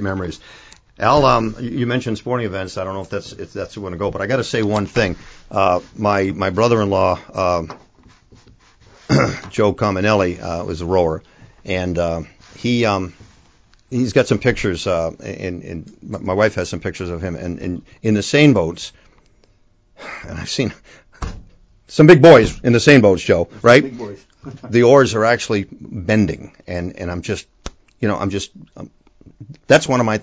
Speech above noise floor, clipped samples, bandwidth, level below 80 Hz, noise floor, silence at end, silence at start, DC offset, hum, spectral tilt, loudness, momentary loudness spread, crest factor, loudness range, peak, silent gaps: 38 dB; 0.2%; 8 kHz; -40 dBFS; -55 dBFS; 0 s; 0 s; under 0.1%; none; -6 dB/octave; -17 LUFS; 20 LU; 18 dB; 10 LU; 0 dBFS; none